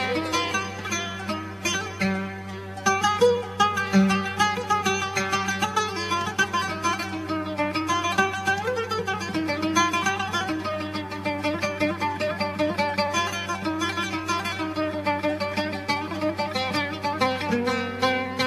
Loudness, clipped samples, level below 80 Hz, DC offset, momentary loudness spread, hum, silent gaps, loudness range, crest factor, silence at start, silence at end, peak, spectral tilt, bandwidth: -25 LUFS; under 0.1%; -60 dBFS; under 0.1%; 6 LU; none; none; 3 LU; 18 dB; 0 s; 0 s; -6 dBFS; -4 dB/octave; 14 kHz